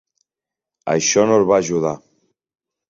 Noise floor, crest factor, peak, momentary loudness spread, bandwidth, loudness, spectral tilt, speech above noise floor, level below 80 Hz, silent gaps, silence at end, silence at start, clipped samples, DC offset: -87 dBFS; 18 dB; -2 dBFS; 14 LU; 7.8 kHz; -17 LUFS; -4 dB/octave; 71 dB; -58 dBFS; none; 0.9 s; 0.85 s; under 0.1%; under 0.1%